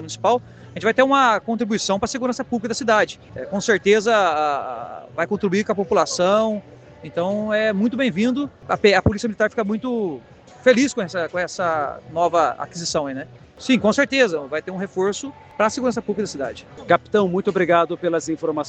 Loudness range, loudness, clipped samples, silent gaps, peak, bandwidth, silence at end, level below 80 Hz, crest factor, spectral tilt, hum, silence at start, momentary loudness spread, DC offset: 2 LU; -20 LUFS; under 0.1%; none; 0 dBFS; 9 kHz; 0 s; -50 dBFS; 20 dB; -4.5 dB/octave; none; 0 s; 12 LU; under 0.1%